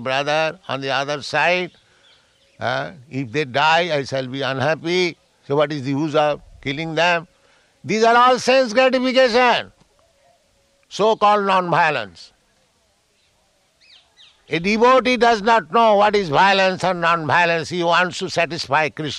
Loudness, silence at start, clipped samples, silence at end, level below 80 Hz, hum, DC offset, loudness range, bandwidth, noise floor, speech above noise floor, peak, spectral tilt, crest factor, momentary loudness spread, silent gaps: -18 LUFS; 0 s; under 0.1%; 0 s; -56 dBFS; none; under 0.1%; 6 LU; 11.5 kHz; -62 dBFS; 44 dB; -4 dBFS; -4.5 dB/octave; 16 dB; 11 LU; none